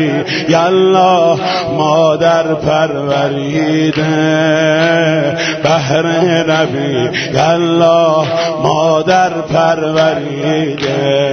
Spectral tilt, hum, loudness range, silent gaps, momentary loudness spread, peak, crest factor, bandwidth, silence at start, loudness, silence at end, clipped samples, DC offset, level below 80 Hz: -5.5 dB/octave; none; 1 LU; none; 5 LU; 0 dBFS; 12 dB; 6.6 kHz; 0 s; -12 LUFS; 0 s; under 0.1%; under 0.1%; -48 dBFS